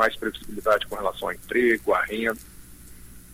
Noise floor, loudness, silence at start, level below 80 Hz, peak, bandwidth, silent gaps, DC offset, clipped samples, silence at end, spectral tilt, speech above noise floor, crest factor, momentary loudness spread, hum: -44 dBFS; -25 LUFS; 0 s; -48 dBFS; -8 dBFS; 16 kHz; none; under 0.1%; under 0.1%; 0 s; -4 dB/octave; 20 dB; 18 dB; 10 LU; none